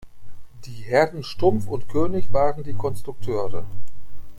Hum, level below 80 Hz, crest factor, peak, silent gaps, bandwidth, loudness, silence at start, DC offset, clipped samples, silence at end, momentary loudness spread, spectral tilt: none; -42 dBFS; 14 dB; -4 dBFS; none; 16.5 kHz; -24 LUFS; 0.05 s; under 0.1%; under 0.1%; 0 s; 20 LU; -7 dB/octave